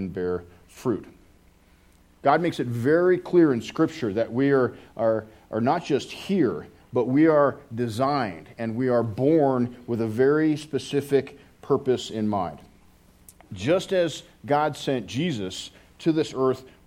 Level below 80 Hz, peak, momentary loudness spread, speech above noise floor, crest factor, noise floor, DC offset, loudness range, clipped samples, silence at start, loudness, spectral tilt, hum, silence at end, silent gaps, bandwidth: -60 dBFS; -4 dBFS; 11 LU; 33 dB; 20 dB; -57 dBFS; under 0.1%; 4 LU; under 0.1%; 0 s; -24 LUFS; -6.5 dB/octave; none; 0.2 s; none; 15.5 kHz